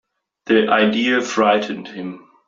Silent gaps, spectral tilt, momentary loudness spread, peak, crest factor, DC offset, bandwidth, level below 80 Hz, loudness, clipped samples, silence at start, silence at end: none; -4.5 dB/octave; 16 LU; -2 dBFS; 16 dB; under 0.1%; 7.6 kHz; -64 dBFS; -17 LUFS; under 0.1%; 0.45 s; 0.3 s